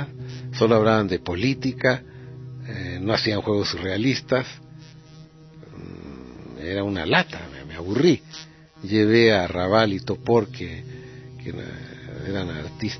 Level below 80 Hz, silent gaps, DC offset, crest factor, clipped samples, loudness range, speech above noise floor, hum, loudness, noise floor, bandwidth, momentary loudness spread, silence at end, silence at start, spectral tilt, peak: -50 dBFS; none; under 0.1%; 22 dB; under 0.1%; 7 LU; 24 dB; none; -22 LUFS; -46 dBFS; 6.4 kHz; 21 LU; 0 s; 0 s; -6 dB/octave; -2 dBFS